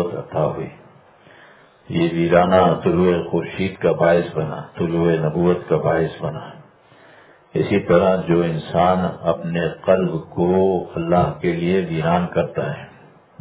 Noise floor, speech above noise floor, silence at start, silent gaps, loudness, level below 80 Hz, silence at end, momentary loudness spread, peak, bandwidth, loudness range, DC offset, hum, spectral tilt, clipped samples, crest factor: -49 dBFS; 30 dB; 0 s; none; -19 LUFS; -44 dBFS; 0.5 s; 10 LU; 0 dBFS; 4 kHz; 3 LU; under 0.1%; none; -11.5 dB/octave; under 0.1%; 18 dB